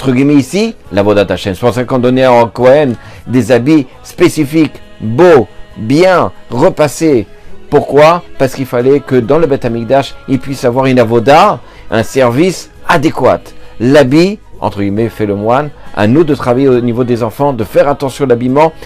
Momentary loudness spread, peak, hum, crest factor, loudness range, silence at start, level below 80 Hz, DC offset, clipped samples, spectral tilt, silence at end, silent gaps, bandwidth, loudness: 9 LU; 0 dBFS; none; 10 dB; 2 LU; 0 s; -38 dBFS; under 0.1%; 2%; -6.5 dB/octave; 0 s; none; 15.5 kHz; -10 LUFS